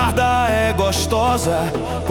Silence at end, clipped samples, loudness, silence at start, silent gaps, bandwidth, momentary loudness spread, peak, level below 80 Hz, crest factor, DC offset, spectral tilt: 0 s; under 0.1%; -18 LUFS; 0 s; none; 18 kHz; 5 LU; -4 dBFS; -34 dBFS; 14 dB; under 0.1%; -4.5 dB/octave